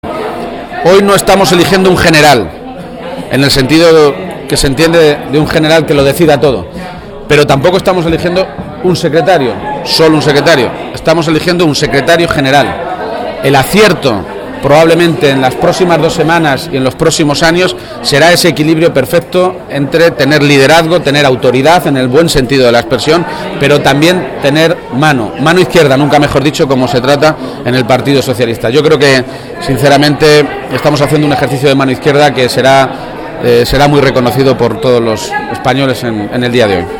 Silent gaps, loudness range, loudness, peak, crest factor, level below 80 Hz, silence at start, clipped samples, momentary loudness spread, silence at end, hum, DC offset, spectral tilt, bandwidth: none; 2 LU; -8 LUFS; 0 dBFS; 8 dB; -32 dBFS; 0.05 s; 2%; 9 LU; 0 s; none; under 0.1%; -5 dB/octave; 19.5 kHz